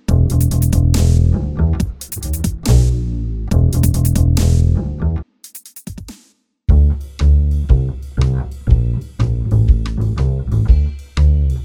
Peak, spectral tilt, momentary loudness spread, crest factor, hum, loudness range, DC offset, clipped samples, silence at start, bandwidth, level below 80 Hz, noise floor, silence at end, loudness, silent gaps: 0 dBFS; -7 dB/octave; 10 LU; 14 dB; none; 2 LU; under 0.1%; under 0.1%; 0.1 s; 19.5 kHz; -16 dBFS; -54 dBFS; 0 s; -16 LUFS; none